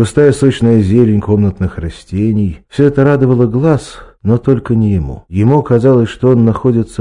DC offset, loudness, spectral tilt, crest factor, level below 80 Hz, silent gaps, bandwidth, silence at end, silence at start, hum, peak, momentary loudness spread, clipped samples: under 0.1%; -12 LUFS; -8.5 dB/octave; 10 dB; -34 dBFS; none; 10.5 kHz; 0.05 s; 0 s; none; 0 dBFS; 9 LU; 1%